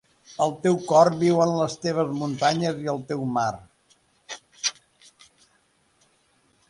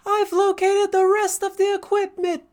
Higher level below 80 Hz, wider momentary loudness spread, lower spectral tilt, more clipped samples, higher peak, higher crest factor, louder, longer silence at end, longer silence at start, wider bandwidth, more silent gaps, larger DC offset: about the same, -64 dBFS vs -66 dBFS; first, 19 LU vs 5 LU; first, -5 dB/octave vs -1.5 dB/octave; neither; about the same, -4 dBFS vs -6 dBFS; first, 22 dB vs 14 dB; second, -23 LUFS vs -20 LUFS; first, 2 s vs 0.15 s; first, 0.3 s vs 0.05 s; second, 11.5 kHz vs 19.5 kHz; neither; neither